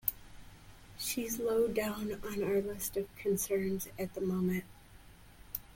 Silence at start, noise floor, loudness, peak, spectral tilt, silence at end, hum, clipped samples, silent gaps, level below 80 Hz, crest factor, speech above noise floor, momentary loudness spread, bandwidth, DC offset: 0.05 s; -56 dBFS; -35 LUFS; -10 dBFS; -5 dB/octave; 0 s; none; under 0.1%; none; -58 dBFS; 26 dB; 22 dB; 10 LU; 17 kHz; under 0.1%